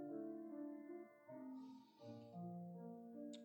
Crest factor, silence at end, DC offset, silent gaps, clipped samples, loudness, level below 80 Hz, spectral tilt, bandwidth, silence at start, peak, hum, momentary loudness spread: 14 dB; 0 s; under 0.1%; none; under 0.1%; -55 LUFS; under -90 dBFS; -8 dB/octave; 19 kHz; 0 s; -40 dBFS; none; 8 LU